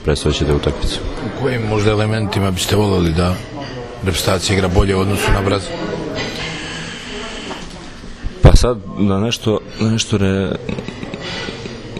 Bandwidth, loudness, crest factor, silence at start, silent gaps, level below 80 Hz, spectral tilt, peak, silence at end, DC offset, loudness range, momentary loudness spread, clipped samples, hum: 14 kHz; -18 LUFS; 16 dB; 0 s; none; -24 dBFS; -5.5 dB/octave; 0 dBFS; 0 s; under 0.1%; 3 LU; 13 LU; 0.2%; none